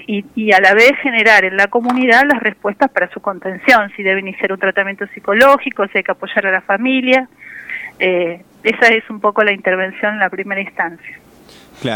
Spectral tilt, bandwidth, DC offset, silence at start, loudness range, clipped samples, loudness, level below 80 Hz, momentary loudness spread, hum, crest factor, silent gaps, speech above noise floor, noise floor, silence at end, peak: -4.5 dB/octave; 19 kHz; under 0.1%; 0 s; 4 LU; under 0.1%; -13 LUFS; -58 dBFS; 13 LU; none; 14 dB; none; 28 dB; -42 dBFS; 0 s; 0 dBFS